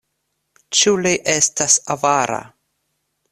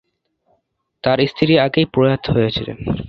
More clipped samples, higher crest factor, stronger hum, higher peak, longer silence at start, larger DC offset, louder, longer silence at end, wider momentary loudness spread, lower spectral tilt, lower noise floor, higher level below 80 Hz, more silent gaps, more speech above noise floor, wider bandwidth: neither; about the same, 20 dB vs 18 dB; neither; about the same, 0 dBFS vs 0 dBFS; second, 0.7 s vs 1.05 s; neither; about the same, -16 LUFS vs -17 LUFS; first, 0.85 s vs 0 s; second, 5 LU vs 9 LU; second, -1.5 dB/octave vs -8.5 dB/octave; first, -73 dBFS vs -67 dBFS; second, -60 dBFS vs -42 dBFS; neither; first, 55 dB vs 51 dB; first, 14 kHz vs 6.4 kHz